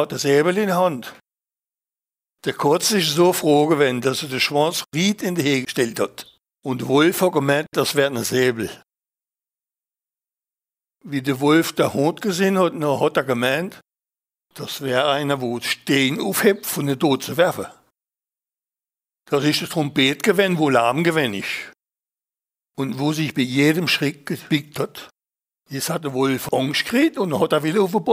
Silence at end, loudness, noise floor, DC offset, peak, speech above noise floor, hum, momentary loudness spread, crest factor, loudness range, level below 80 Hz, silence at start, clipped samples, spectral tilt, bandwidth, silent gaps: 0 s; -20 LUFS; under -90 dBFS; under 0.1%; -2 dBFS; over 70 dB; none; 11 LU; 20 dB; 4 LU; -64 dBFS; 0 s; under 0.1%; -4.5 dB/octave; 16 kHz; none